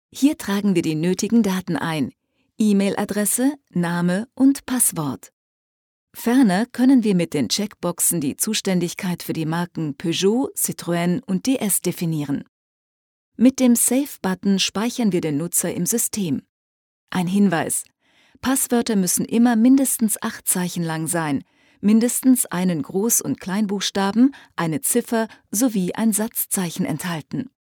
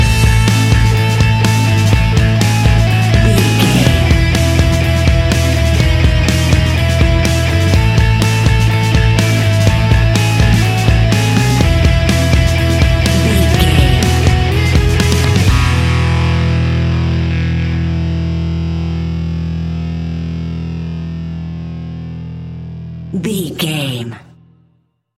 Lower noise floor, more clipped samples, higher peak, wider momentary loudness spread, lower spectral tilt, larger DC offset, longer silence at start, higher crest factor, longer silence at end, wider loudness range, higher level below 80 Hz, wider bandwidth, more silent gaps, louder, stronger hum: about the same, -57 dBFS vs -58 dBFS; neither; second, -4 dBFS vs 0 dBFS; about the same, 9 LU vs 11 LU; about the same, -4.5 dB/octave vs -5.5 dB/octave; neither; first, 0.15 s vs 0 s; about the same, 16 dB vs 12 dB; second, 0.2 s vs 1 s; second, 3 LU vs 11 LU; second, -62 dBFS vs -18 dBFS; first, 19.5 kHz vs 15.5 kHz; first, 5.33-6.07 s, 12.49-13.32 s, 16.49-17.07 s vs none; second, -20 LUFS vs -12 LUFS; neither